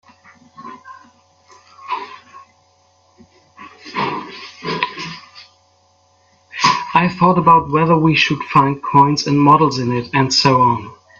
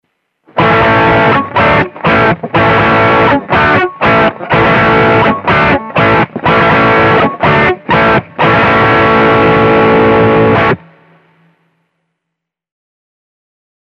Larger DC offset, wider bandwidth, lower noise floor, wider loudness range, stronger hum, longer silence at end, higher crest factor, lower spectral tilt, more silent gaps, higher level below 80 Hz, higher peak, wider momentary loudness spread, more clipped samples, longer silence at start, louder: neither; about the same, 7.8 kHz vs 7.2 kHz; second, -56 dBFS vs -76 dBFS; first, 21 LU vs 4 LU; neither; second, 0.25 s vs 3.1 s; first, 18 dB vs 10 dB; second, -5 dB/octave vs -7.5 dB/octave; neither; second, -52 dBFS vs -34 dBFS; about the same, 0 dBFS vs 0 dBFS; first, 21 LU vs 3 LU; neither; about the same, 0.6 s vs 0.55 s; second, -15 LUFS vs -8 LUFS